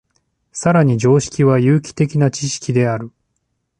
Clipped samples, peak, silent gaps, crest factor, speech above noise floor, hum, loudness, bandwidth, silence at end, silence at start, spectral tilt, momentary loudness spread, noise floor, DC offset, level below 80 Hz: under 0.1%; -2 dBFS; none; 14 dB; 55 dB; none; -16 LUFS; 10 kHz; 0.7 s; 0.55 s; -6.5 dB/octave; 9 LU; -70 dBFS; under 0.1%; -50 dBFS